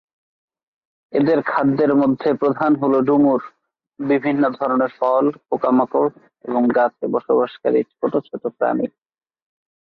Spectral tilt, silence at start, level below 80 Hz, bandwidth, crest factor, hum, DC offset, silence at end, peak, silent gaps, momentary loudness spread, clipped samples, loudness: -10 dB/octave; 1.15 s; -64 dBFS; 4.9 kHz; 14 dB; none; under 0.1%; 1.05 s; -6 dBFS; none; 8 LU; under 0.1%; -19 LUFS